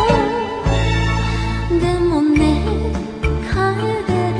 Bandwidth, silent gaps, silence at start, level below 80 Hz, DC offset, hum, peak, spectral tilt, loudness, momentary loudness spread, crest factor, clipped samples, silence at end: 10.5 kHz; none; 0 s; -24 dBFS; under 0.1%; none; -2 dBFS; -6.5 dB/octave; -18 LUFS; 6 LU; 14 dB; under 0.1%; 0 s